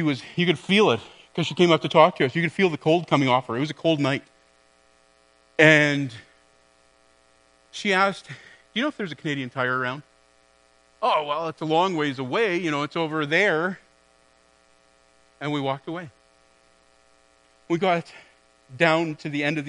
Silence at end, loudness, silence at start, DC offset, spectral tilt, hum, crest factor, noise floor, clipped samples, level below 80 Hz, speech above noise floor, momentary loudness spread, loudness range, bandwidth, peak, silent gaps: 0 s; -23 LUFS; 0 s; under 0.1%; -5.5 dB/octave; none; 24 dB; -60 dBFS; under 0.1%; -70 dBFS; 37 dB; 14 LU; 10 LU; 10.5 kHz; 0 dBFS; none